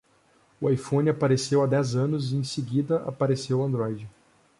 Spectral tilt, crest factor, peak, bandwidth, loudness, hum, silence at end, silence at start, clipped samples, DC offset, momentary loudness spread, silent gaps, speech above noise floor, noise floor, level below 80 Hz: -6.5 dB/octave; 14 dB; -12 dBFS; 11.5 kHz; -26 LUFS; none; 0.5 s; 0.6 s; under 0.1%; under 0.1%; 7 LU; none; 38 dB; -62 dBFS; -62 dBFS